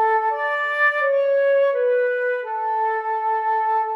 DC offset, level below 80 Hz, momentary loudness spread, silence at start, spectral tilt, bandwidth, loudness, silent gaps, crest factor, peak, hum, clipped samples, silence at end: under 0.1%; under -90 dBFS; 5 LU; 0 s; 0 dB/octave; 5.8 kHz; -20 LUFS; none; 10 dB; -10 dBFS; none; under 0.1%; 0 s